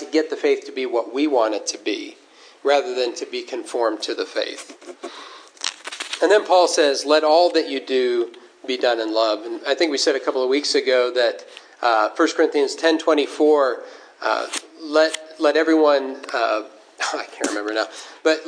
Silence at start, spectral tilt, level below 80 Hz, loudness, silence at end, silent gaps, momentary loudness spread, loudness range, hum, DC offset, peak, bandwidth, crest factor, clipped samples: 0 s; -0.5 dB/octave; -88 dBFS; -20 LUFS; 0 s; none; 13 LU; 6 LU; none; under 0.1%; 0 dBFS; 10.5 kHz; 20 dB; under 0.1%